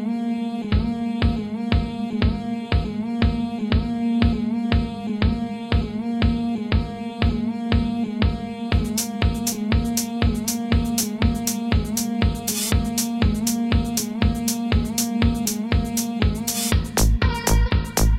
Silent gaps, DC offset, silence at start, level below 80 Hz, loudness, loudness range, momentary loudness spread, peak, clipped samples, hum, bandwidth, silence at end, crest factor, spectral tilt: none; under 0.1%; 0 s; -26 dBFS; -23 LUFS; 2 LU; 4 LU; -4 dBFS; under 0.1%; none; 16.5 kHz; 0 s; 18 dB; -5 dB/octave